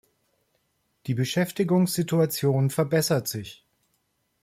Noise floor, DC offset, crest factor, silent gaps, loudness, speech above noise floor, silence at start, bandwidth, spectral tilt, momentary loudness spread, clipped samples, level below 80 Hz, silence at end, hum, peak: -73 dBFS; under 0.1%; 14 dB; none; -24 LUFS; 49 dB; 1.05 s; 16.5 kHz; -5.5 dB/octave; 11 LU; under 0.1%; -64 dBFS; 0.9 s; none; -12 dBFS